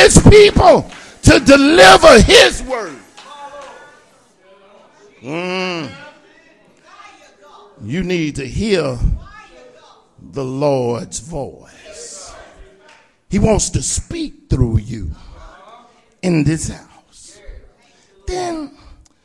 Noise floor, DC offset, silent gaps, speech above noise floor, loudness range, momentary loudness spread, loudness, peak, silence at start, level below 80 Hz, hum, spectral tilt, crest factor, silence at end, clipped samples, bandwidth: -52 dBFS; under 0.1%; none; 39 dB; 18 LU; 26 LU; -12 LUFS; 0 dBFS; 0 s; -28 dBFS; none; -4.5 dB/octave; 14 dB; 0.6 s; 1%; 12 kHz